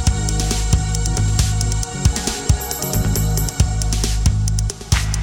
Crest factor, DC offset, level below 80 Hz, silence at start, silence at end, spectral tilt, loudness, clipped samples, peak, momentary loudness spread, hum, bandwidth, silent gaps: 16 dB; under 0.1%; -22 dBFS; 0 s; 0 s; -4 dB/octave; -19 LUFS; under 0.1%; -2 dBFS; 2 LU; none; 19 kHz; none